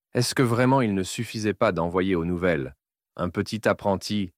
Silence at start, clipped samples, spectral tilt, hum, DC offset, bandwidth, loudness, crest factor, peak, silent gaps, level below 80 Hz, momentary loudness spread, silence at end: 0.15 s; under 0.1%; -5.5 dB/octave; none; under 0.1%; 16 kHz; -25 LUFS; 16 dB; -8 dBFS; none; -52 dBFS; 8 LU; 0.1 s